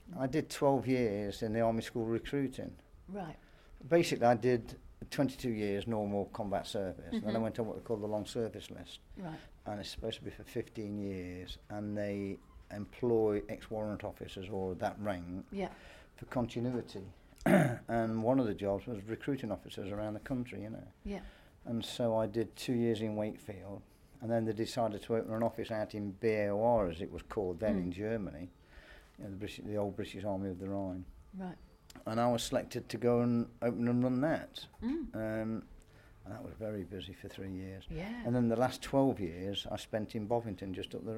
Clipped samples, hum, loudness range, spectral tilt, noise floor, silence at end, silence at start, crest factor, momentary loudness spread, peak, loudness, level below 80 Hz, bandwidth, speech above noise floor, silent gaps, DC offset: under 0.1%; none; 7 LU; -6.5 dB/octave; -58 dBFS; 0 s; 0 s; 22 dB; 16 LU; -14 dBFS; -36 LUFS; -58 dBFS; 16 kHz; 23 dB; none; under 0.1%